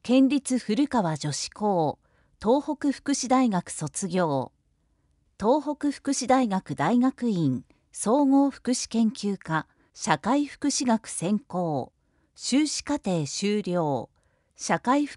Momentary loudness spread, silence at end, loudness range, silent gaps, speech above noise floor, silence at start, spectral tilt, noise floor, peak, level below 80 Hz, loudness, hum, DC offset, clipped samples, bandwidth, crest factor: 9 LU; 0 s; 3 LU; none; 44 dB; 0.05 s; -5 dB/octave; -69 dBFS; -6 dBFS; -62 dBFS; -26 LUFS; none; under 0.1%; under 0.1%; 11.5 kHz; 20 dB